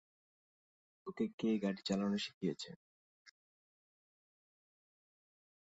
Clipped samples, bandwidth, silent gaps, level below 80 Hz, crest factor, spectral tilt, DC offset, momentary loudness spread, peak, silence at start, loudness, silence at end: under 0.1%; 8 kHz; 1.33-1.38 s, 2.34-2.41 s, 2.76-3.25 s; -80 dBFS; 20 dB; -5.5 dB/octave; under 0.1%; 15 LU; -24 dBFS; 1.05 s; -39 LUFS; 2.3 s